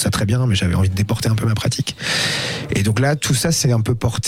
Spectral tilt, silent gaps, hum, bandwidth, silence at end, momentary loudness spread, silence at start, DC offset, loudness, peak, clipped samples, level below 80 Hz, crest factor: -4.5 dB/octave; none; none; 16.5 kHz; 0 s; 4 LU; 0 s; under 0.1%; -18 LUFS; -8 dBFS; under 0.1%; -40 dBFS; 10 dB